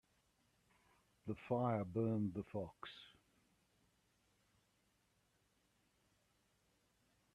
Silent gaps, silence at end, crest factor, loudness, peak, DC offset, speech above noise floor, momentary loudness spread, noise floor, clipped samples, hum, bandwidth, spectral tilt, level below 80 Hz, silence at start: none; 4.25 s; 22 dB; -42 LUFS; -26 dBFS; under 0.1%; 38 dB; 16 LU; -80 dBFS; under 0.1%; 60 Hz at -75 dBFS; 12 kHz; -8.5 dB/octave; -78 dBFS; 1.25 s